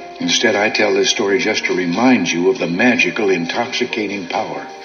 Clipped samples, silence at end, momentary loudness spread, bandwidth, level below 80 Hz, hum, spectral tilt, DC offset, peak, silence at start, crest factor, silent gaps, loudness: under 0.1%; 0 s; 8 LU; 7 kHz; -64 dBFS; none; -3 dB/octave; under 0.1%; 0 dBFS; 0 s; 16 dB; none; -16 LUFS